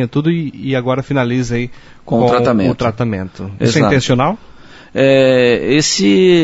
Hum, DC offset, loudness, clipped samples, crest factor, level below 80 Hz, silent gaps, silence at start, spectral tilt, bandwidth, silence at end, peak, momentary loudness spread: none; under 0.1%; -14 LUFS; under 0.1%; 14 dB; -42 dBFS; none; 0 s; -5.5 dB/octave; 8 kHz; 0 s; 0 dBFS; 10 LU